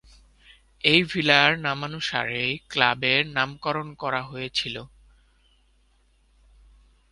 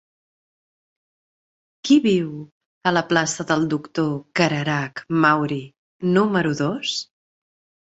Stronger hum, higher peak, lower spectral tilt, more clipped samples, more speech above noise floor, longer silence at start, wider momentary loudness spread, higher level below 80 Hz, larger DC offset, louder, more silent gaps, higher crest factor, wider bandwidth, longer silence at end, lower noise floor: neither; about the same, 0 dBFS vs -2 dBFS; about the same, -4 dB/octave vs -5 dB/octave; neither; second, 38 dB vs over 70 dB; second, 0.85 s vs 1.85 s; about the same, 11 LU vs 11 LU; first, -56 dBFS vs -62 dBFS; neither; about the same, -23 LUFS vs -21 LUFS; second, none vs 2.52-2.81 s, 5.78-6.00 s; first, 26 dB vs 20 dB; first, 11.5 kHz vs 8.2 kHz; first, 2.25 s vs 0.8 s; second, -63 dBFS vs under -90 dBFS